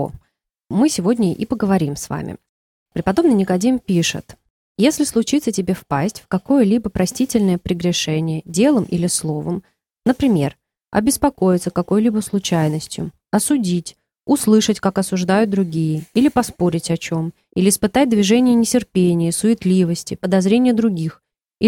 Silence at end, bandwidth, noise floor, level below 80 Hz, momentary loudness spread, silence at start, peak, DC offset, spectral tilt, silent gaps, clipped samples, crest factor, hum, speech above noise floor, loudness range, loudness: 0 s; 17 kHz; -67 dBFS; -46 dBFS; 10 LU; 0 s; -2 dBFS; under 0.1%; -5.5 dB/octave; 2.49-2.86 s, 4.50-4.75 s; under 0.1%; 16 dB; none; 50 dB; 3 LU; -18 LUFS